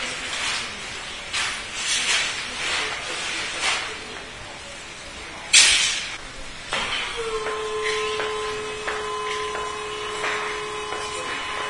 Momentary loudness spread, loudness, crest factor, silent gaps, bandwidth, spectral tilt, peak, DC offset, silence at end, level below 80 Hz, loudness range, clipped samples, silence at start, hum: 15 LU; -23 LUFS; 26 dB; none; 11 kHz; 0.5 dB/octave; 0 dBFS; 0.1%; 0 s; -48 dBFS; 7 LU; under 0.1%; 0 s; none